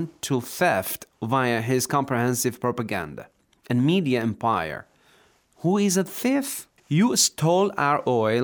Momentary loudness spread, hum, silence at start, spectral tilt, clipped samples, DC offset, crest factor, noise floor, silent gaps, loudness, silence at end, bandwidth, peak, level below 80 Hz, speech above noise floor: 11 LU; none; 0 s; -4.5 dB/octave; under 0.1%; under 0.1%; 16 dB; -59 dBFS; none; -23 LUFS; 0 s; over 20 kHz; -6 dBFS; -64 dBFS; 36 dB